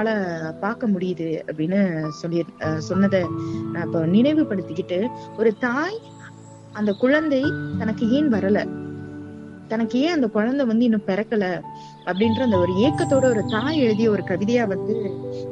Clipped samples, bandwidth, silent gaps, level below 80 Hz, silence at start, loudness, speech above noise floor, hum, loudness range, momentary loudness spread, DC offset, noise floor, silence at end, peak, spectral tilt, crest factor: under 0.1%; 9 kHz; none; -60 dBFS; 0 s; -22 LUFS; 21 dB; none; 3 LU; 12 LU; under 0.1%; -42 dBFS; 0 s; -6 dBFS; -7 dB/octave; 16 dB